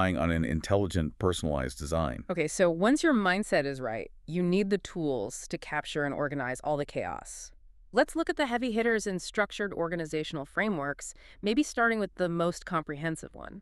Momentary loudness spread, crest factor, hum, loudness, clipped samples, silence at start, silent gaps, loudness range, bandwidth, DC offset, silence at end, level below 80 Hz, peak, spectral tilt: 10 LU; 20 dB; none; -30 LUFS; under 0.1%; 0 s; none; 4 LU; 13 kHz; under 0.1%; 0 s; -48 dBFS; -10 dBFS; -5 dB/octave